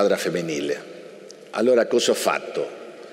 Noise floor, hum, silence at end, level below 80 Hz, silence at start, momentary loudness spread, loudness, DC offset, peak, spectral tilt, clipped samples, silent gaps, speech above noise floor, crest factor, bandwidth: -42 dBFS; none; 0 s; -74 dBFS; 0 s; 22 LU; -23 LUFS; under 0.1%; -6 dBFS; -3.5 dB/octave; under 0.1%; none; 21 dB; 16 dB; 16 kHz